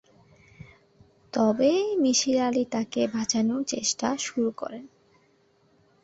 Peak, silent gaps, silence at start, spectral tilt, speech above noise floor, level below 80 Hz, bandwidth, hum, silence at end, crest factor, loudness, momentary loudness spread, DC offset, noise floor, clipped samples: -10 dBFS; none; 1.35 s; -3.5 dB/octave; 39 dB; -66 dBFS; 8.2 kHz; none; 1.15 s; 18 dB; -25 LUFS; 9 LU; under 0.1%; -64 dBFS; under 0.1%